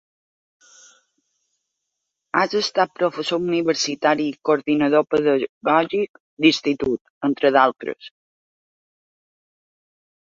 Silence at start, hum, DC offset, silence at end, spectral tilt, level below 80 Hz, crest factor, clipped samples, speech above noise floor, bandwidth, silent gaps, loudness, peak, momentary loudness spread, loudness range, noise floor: 2.35 s; none; under 0.1%; 2.2 s; -4 dB/octave; -62 dBFS; 22 dB; under 0.1%; 60 dB; 8 kHz; 5.49-5.61 s, 6.09-6.14 s, 6.20-6.37 s, 7.01-7.21 s; -20 LUFS; -2 dBFS; 7 LU; 5 LU; -80 dBFS